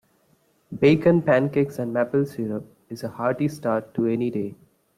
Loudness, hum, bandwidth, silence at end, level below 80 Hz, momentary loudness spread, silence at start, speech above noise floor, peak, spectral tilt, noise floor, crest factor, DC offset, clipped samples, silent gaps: -23 LUFS; none; 15 kHz; 0.45 s; -62 dBFS; 16 LU; 0.7 s; 41 dB; -6 dBFS; -8 dB/octave; -64 dBFS; 18 dB; under 0.1%; under 0.1%; none